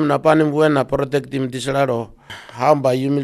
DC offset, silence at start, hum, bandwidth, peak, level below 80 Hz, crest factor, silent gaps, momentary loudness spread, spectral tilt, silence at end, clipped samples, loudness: under 0.1%; 0 s; none; 13.5 kHz; 0 dBFS; -50 dBFS; 18 dB; none; 12 LU; -6.5 dB/octave; 0 s; under 0.1%; -18 LUFS